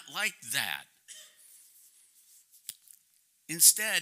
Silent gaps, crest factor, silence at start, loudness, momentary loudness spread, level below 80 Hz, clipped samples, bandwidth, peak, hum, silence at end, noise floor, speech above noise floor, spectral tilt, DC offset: none; 28 dB; 0.05 s; -24 LUFS; 29 LU; -88 dBFS; under 0.1%; 16 kHz; -6 dBFS; none; 0 s; -69 dBFS; 40 dB; 1 dB/octave; under 0.1%